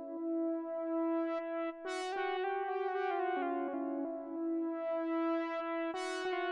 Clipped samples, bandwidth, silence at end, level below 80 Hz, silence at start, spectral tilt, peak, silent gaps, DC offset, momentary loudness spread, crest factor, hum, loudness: under 0.1%; 11 kHz; 0 s; -84 dBFS; 0 s; -3 dB/octave; -26 dBFS; none; under 0.1%; 4 LU; 10 dB; none; -37 LUFS